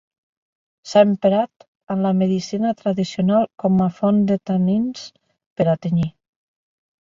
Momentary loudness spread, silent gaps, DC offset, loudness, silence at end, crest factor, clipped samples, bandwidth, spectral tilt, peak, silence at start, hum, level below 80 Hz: 11 LU; 1.56-1.60 s, 1.68-1.80 s, 5.46-5.56 s; under 0.1%; -19 LUFS; 0.9 s; 18 dB; under 0.1%; 7.4 kHz; -7.5 dB/octave; -2 dBFS; 0.85 s; none; -58 dBFS